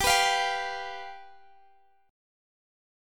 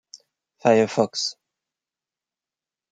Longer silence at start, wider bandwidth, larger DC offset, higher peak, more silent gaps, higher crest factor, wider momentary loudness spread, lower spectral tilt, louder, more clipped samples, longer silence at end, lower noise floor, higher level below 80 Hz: second, 0 s vs 0.15 s; first, 17.5 kHz vs 9.4 kHz; neither; second, -10 dBFS vs -4 dBFS; neither; about the same, 22 dB vs 22 dB; first, 21 LU vs 9 LU; second, 0 dB/octave vs -4 dB/octave; second, -27 LUFS vs -22 LUFS; neither; first, 1.8 s vs 1.6 s; second, -63 dBFS vs under -90 dBFS; first, -54 dBFS vs -72 dBFS